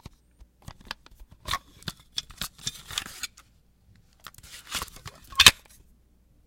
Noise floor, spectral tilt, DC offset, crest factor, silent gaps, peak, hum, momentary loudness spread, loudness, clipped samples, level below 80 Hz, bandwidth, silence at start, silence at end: -61 dBFS; 0 dB/octave; under 0.1%; 30 dB; none; 0 dBFS; none; 28 LU; -24 LUFS; under 0.1%; -50 dBFS; 17 kHz; 1.45 s; 0.9 s